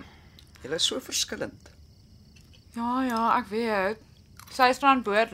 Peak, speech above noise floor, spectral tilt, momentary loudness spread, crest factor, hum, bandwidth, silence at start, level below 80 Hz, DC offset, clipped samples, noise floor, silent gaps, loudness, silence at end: -6 dBFS; 28 dB; -2.5 dB/octave; 17 LU; 22 dB; none; 16 kHz; 0 s; -58 dBFS; under 0.1%; under 0.1%; -53 dBFS; none; -26 LUFS; 0 s